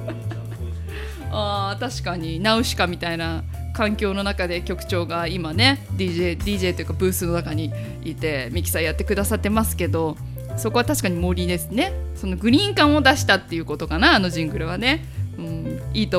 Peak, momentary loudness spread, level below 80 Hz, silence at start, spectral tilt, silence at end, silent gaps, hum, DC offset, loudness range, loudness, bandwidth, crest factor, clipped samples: 0 dBFS; 13 LU; -34 dBFS; 0 s; -4.5 dB/octave; 0 s; none; none; under 0.1%; 5 LU; -22 LUFS; 16 kHz; 22 dB; under 0.1%